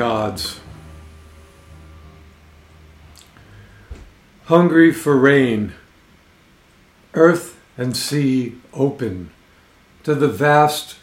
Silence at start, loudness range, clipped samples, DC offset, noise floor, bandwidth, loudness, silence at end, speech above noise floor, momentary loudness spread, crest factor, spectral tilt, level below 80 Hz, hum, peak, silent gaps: 0 s; 5 LU; under 0.1%; under 0.1%; -52 dBFS; 16 kHz; -17 LUFS; 0.1 s; 36 dB; 16 LU; 20 dB; -6 dB/octave; -50 dBFS; none; 0 dBFS; none